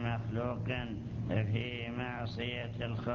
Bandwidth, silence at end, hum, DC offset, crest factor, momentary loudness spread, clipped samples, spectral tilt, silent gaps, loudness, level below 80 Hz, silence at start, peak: 6.8 kHz; 0 s; none; under 0.1%; 18 dB; 4 LU; under 0.1%; -5.5 dB/octave; none; -37 LUFS; -52 dBFS; 0 s; -18 dBFS